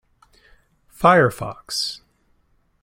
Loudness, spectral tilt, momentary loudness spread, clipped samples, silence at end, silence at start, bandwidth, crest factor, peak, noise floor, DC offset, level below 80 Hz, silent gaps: -19 LUFS; -4.5 dB/octave; 17 LU; under 0.1%; 0.85 s; 1 s; 16.5 kHz; 22 dB; -2 dBFS; -63 dBFS; under 0.1%; -52 dBFS; none